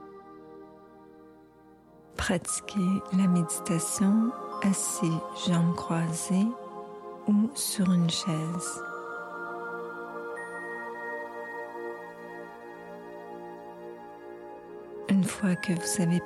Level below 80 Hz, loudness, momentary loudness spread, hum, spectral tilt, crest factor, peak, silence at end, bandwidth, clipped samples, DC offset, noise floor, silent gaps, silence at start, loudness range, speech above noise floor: -60 dBFS; -29 LUFS; 18 LU; 60 Hz at -50 dBFS; -5 dB/octave; 16 dB; -14 dBFS; 0 s; 13.5 kHz; under 0.1%; under 0.1%; -55 dBFS; none; 0 s; 12 LU; 29 dB